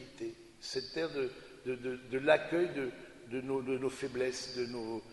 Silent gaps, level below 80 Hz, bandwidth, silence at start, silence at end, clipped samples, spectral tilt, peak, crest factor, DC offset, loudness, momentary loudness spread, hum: none; -68 dBFS; 11.5 kHz; 0 s; 0 s; under 0.1%; -4.5 dB/octave; -12 dBFS; 24 dB; under 0.1%; -36 LUFS; 15 LU; none